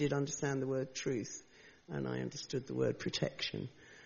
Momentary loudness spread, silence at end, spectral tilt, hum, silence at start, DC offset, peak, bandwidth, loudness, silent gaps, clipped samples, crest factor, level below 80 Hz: 10 LU; 0 s; -5 dB/octave; none; 0 s; under 0.1%; -18 dBFS; 7.2 kHz; -38 LUFS; none; under 0.1%; 20 dB; -68 dBFS